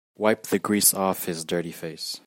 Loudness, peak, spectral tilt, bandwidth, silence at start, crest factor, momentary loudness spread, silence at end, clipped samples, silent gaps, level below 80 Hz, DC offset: -23 LUFS; -2 dBFS; -3 dB/octave; 16.5 kHz; 0.2 s; 22 dB; 13 LU; 0.1 s; under 0.1%; none; -70 dBFS; under 0.1%